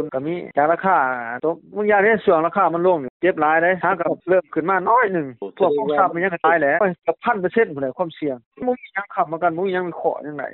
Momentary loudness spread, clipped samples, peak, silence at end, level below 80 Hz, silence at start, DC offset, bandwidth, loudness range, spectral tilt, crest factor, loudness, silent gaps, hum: 9 LU; under 0.1%; -4 dBFS; 0 s; -64 dBFS; 0 s; under 0.1%; 4.2 kHz; 4 LU; -4.5 dB/octave; 16 dB; -20 LUFS; 3.10-3.20 s, 8.46-8.52 s; none